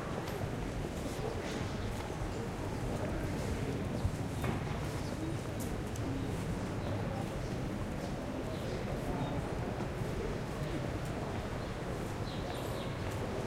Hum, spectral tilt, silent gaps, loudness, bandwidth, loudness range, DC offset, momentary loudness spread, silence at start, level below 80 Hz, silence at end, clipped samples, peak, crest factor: none; -6 dB/octave; none; -38 LUFS; 16 kHz; 1 LU; under 0.1%; 2 LU; 0 s; -46 dBFS; 0 s; under 0.1%; -22 dBFS; 16 dB